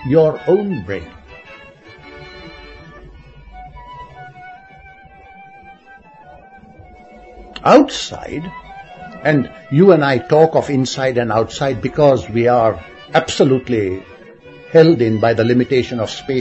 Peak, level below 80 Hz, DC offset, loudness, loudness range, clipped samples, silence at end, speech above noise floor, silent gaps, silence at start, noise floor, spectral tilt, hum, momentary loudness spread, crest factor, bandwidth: 0 dBFS; -46 dBFS; under 0.1%; -15 LUFS; 23 LU; under 0.1%; 0 s; 29 dB; none; 0 s; -43 dBFS; -6.5 dB/octave; none; 25 LU; 16 dB; 8.4 kHz